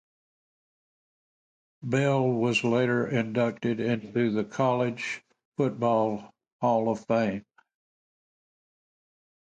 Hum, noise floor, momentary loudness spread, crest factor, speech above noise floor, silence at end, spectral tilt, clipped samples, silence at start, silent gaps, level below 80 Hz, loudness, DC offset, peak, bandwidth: none; under -90 dBFS; 9 LU; 18 dB; over 64 dB; 2.05 s; -6.5 dB/octave; under 0.1%; 1.8 s; 5.45-5.52 s, 6.52-6.59 s; -68 dBFS; -27 LUFS; under 0.1%; -12 dBFS; 9.2 kHz